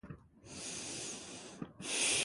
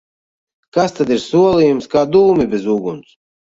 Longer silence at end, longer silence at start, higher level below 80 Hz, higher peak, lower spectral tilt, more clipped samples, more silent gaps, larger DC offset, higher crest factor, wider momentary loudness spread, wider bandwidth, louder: second, 0 s vs 0.6 s; second, 0.05 s vs 0.75 s; second, -68 dBFS vs -48 dBFS; second, -20 dBFS vs -2 dBFS; second, -1 dB/octave vs -6.5 dB/octave; neither; neither; neither; first, 20 dB vs 14 dB; first, 19 LU vs 9 LU; first, 12 kHz vs 7.8 kHz; second, -39 LUFS vs -14 LUFS